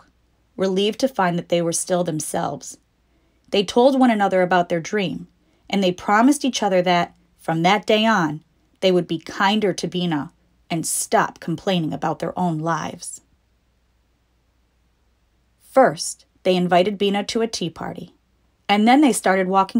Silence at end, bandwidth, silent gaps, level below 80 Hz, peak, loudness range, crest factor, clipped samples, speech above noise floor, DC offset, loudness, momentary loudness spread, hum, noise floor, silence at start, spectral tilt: 0 s; 16 kHz; none; -60 dBFS; -2 dBFS; 7 LU; 18 dB; under 0.1%; 44 dB; under 0.1%; -20 LUFS; 12 LU; none; -63 dBFS; 0.6 s; -4.5 dB/octave